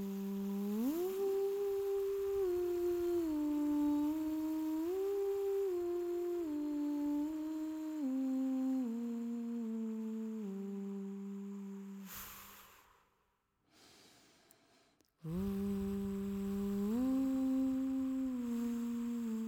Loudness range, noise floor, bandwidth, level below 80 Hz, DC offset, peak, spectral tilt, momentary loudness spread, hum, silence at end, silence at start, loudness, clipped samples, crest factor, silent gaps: 13 LU; -80 dBFS; 18.5 kHz; -64 dBFS; under 0.1%; -28 dBFS; -7.5 dB/octave; 10 LU; none; 0 s; 0 s; -38 LUFS; under 0.1%; 10 dB; none